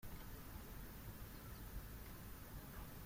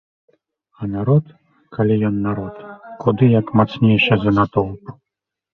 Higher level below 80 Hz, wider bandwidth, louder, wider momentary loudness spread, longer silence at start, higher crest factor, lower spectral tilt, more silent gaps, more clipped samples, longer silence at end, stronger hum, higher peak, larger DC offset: second, -56 dBFS vs -46 dBFS; first, 16.5 kHz vs 5.4 kHz; second, -55 LUFS vs -17 LUFS; second, 1 LU vs 17 LU; second, 0 s vs 0.8 s; about the same, 14 dB vs 16 dB; second, -5 dB/octave vs -9.5 dB/octave; neither; neither; second, 0 s vs 0.7 s; neither; second, -38 dBFS vs -2 dBFS; neither